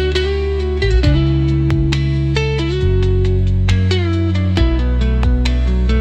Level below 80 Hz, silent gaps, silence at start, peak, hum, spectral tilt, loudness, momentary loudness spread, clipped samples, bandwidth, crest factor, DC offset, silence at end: -18 dBFS; none; 0 s; -2 dBFS; none; -7 dB/octave; -16 LUFS; 3 LU; under 0.1%; 8.2 kHz; 12 dB; under 0.1%; 0 s